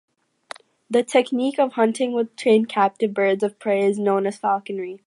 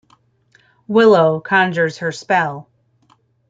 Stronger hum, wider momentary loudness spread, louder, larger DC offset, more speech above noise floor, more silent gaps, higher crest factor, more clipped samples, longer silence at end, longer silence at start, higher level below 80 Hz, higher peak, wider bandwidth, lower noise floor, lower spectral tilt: neither; second, 10 LU vs 13 LU; second, -21 LUFS vs -15 LUFS; neither; second, 22 dB vs 43 dB; neither; about the same, 16 dB vs 16 dB; neither; second, 0.1 s vs 0.9 s; about the same, 0.9 s vs 0.9 s; second, -76 dBFS vs -64 dBFS; about the same, -4 dBFS vs -2 dBFS; first, 11 kHz vs 7.8 kHz; second, -43 dBFS vs -57 dBFS; about the same, -5.5 dB/octave vs -6 dB/octave